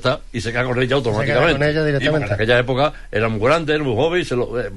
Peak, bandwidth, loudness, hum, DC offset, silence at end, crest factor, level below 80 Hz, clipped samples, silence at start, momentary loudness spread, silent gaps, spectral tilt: -2 dBFS; 11.5 kHz; -18 LUFS; none; 1%; 0 s; 16 dB; -36 dBFS; under 0.1%; 0 s; 6 LU; none; -6 dB/octave